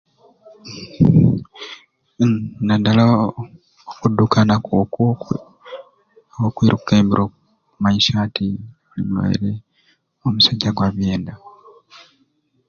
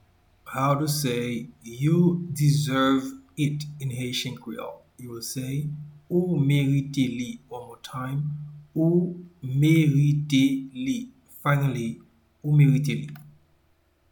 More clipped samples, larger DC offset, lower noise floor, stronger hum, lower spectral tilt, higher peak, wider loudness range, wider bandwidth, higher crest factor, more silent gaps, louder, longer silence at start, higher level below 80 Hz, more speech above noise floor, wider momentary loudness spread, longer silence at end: neither; neither; about the same, -63 dBFS vs -65 dBFS; neither; about the same, -6.5 dB/octave vs -6.5 dB/octave; first, 0 dBFS vs -8 dBFS; about the same, 3 LU vs 4 LU; second, 7 kHz vs 19 kHz; about the same, 18 dB vs 16 dB; neither; first, -18 LUFS vs -25 LUFS; first, 0.65 s vs 0.45 s; first, -44 dBFS vs -58 dBFS; first, 46 dB vs 41 dB; first, 20 LU vs 17 LU; first, 1.2 s vs 0.8 s